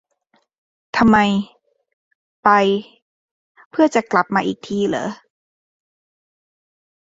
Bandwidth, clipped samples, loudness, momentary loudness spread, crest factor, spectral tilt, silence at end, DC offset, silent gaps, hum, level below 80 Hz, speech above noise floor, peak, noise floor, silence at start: 7.8 kHz; under 0.1%; -18 LUFS; 13 LU; 20 dB; -5.5 dB/octave; 2.05 s; under 0.1%; 1.93-2.43 s, 3.02-3.55 s, 3.66-3.71 s; none; -54 dBFS; 48 dB; 0 dBFS; -64 dBFS; 0.95 s